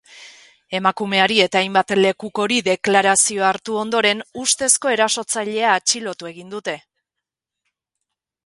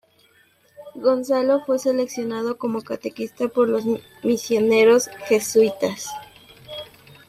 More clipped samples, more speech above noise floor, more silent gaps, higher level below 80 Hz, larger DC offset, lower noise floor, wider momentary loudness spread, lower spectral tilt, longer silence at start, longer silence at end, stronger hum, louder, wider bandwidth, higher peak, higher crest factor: neither; first, 65 dB vs 38 dB; neither; about the same, -64 dBFS vs -66 dBFS; neither; first, -84 dBFS vs -58 dBFS; second, 13 LU vs 19 LU; second, -2 dB/octave vs -4 dB/octave; second, 0.15 s vs 0.8 s; first, 1.65 s vs 0.45 s; neither; first, -17 LUFS vs -21 LUFS; second, 11.5 kHz vs 15.5 kHz; first, 0 dBFS vs -6 dBFS; about the same, 20 dB vs 16 dB